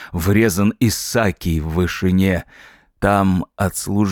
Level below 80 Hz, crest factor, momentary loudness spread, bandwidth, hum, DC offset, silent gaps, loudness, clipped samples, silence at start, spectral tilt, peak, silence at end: -38 dBFS; 16 dB; 6 LU; 18.5 kHz; none; under 0.1%; none; -18 LUFS; under 0.1%; 0 s; -5.5 dB/octave; -2 dBFS; 0 s